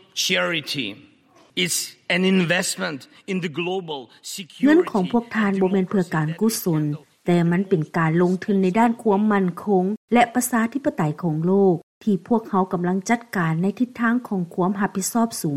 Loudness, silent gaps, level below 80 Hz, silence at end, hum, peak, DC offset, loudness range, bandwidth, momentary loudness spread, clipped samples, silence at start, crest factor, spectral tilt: -21 LUFS; 9.97-10.08 s, 11.83-12.01 s; -64 dBFS; 0 s; none; -4 dBFS; under 0.1%; 3 LU; 16 kHz; 9 LU; under 0.1%; 0.15 s; 18 dB; -5 dB/octave